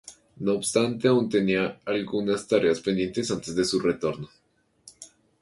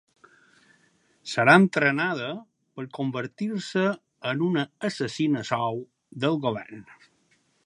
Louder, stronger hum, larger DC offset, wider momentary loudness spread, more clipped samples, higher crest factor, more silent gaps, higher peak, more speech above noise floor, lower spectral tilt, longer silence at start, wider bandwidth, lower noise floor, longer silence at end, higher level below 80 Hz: about the same, -25 LUFS vs -25 LUFS; neither; neither; second, 9 LU vs 22 LU; neither; second, 18 dB vs 26 dB; neither; second, -8 dBFS vs -2 dBFS; second, 31 dB vs 42 dB; about the same, -5 dB/octave vs -6 dB/octave; second, 0.05 s vs 1.25 s; about the same, 11.5 kHz vs 11 kHz; second, -56 dBFS vs -67 dBFS; second, 0.35 s vs 0.85 s; first, -60 dBFS vs -72 dBFS